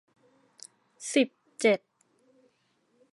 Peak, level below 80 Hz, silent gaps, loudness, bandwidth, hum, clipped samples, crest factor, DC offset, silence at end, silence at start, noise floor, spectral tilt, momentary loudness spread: -10 dBFS; under -90 dBFS; none; -28 LUFS; 11.5 kHz; none; under 0.1%; 22 dB; under 0.1%; 1.35 s; 1 s; -71 dBFS; -3.5 dB/octave; 24 LU